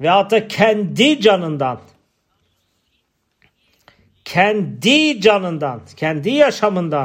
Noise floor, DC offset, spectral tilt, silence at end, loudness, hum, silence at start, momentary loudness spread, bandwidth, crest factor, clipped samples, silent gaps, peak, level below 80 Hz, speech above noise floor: -67 dBFS; under 0.1%; -5 dB/octave; 0 s; -16 LUFS; none; 0 s; 10 LU; 16 kHz; 16 dB; under 0.1%; none; 0 dBFS; -62 dBFS; 51 dB